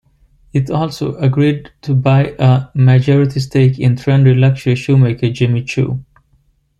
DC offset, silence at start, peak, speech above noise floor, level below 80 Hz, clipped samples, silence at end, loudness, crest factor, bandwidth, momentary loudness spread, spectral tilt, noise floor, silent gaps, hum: under 0.1%; 0.55 s; -2 dBFS; 44 dB; -44 dBFS; under 0.1%; 0.8 s; -14 LUFS; 12 dB; 7.6 kHz; 8 LU; -8 dB/octave; -56 dBFS; none; none